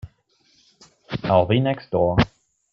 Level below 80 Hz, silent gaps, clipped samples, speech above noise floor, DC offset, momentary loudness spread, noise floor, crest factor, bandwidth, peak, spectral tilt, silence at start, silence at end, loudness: -44 dBFS; none; under 0.1%; 43 dB; under 0.1%; 10 LU; -62 dBFS; 20 dB; 7.6 kHz; -4 dBFS; -8 dB/octave; 0.05 s; 0.45 s; -21 LUFS